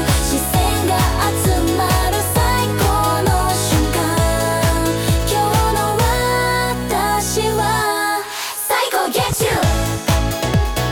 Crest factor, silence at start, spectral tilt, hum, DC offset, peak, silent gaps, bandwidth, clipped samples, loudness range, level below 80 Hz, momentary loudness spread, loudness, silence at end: 12 dB; 0 s; -4 dB/octave; none; under 0.1%; -4 dBFS; none; 18 kHz; under 0.1%; 1 LU; -24 dBFS; 2 LU; -17 LUFS; 0 s